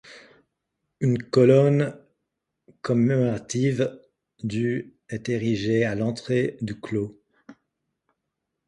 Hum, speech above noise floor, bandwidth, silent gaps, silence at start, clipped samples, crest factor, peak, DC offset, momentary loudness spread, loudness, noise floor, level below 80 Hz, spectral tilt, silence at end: none; 59 dB; 11 kHz; none; 0.1 s; under 0.1%; 20 dB; -6 dBFS; under 0.1%; 14 LU; -24 LUFS; -81 dBFS; -60 dBFS; -7 dB/octave; 1.15 s